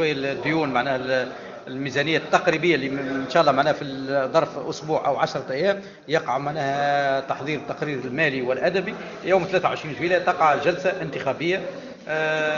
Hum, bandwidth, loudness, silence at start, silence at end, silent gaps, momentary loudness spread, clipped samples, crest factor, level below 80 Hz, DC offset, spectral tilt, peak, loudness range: none; 7.6 kHz; -23 LUFS; 0 s; 0 s; none; 9 LU; under 0.1%; 22 dB; -60 dBFS; under 0.1%; -5.5 dB/octave; -2 dBFS; 2 LU